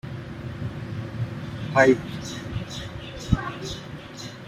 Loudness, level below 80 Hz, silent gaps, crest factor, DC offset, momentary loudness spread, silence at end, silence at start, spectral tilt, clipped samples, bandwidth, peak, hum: -27 LUFS; -42 dBFS; none; 24 dB; under 0.1%; 17 LU; 0 s; 0.05 s; -6 dB/octave; under 0.1%; 14.5 kHz; -4 dBFS; none